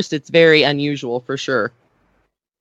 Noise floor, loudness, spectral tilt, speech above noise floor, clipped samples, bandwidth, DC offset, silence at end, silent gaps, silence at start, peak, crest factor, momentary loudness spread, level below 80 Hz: -65 dBFS; -16 LUFS; -5 dB/octave; 49 dB; under 0.1%; 8 kHz; under 0.1%; 0.9 s; none; 0 s; 0 dBFS; 18 dB; 12 LU; -66 dBFS